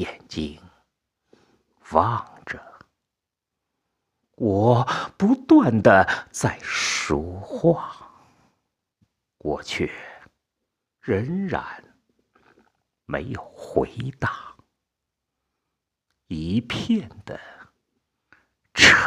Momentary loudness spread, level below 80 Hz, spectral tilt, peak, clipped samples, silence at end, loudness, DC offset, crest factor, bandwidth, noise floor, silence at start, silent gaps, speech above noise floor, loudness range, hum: 21 LU; -52 dBFS; -4.5 dB/octave; 0 dBFS; under 0.1%; 0 s; -22 LUFS; under 0.1%; 24 dB; 14 kHz; -85 dBFS; 0 s; none; 63 dB; 12 LU; none